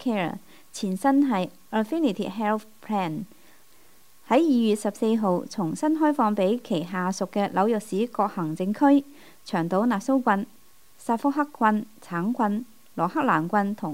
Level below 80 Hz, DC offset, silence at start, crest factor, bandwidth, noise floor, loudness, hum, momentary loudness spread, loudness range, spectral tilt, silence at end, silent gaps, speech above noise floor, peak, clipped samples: -70 dBFS; 0.3%; 0 s; 18 dB; 16 kHz; -58 dBFS; -25 LUFS; none; 10 LU; 2 LU; -6.5 dB/octave; 0 s; none; 34 dB; -6 dBFS; under 0.1%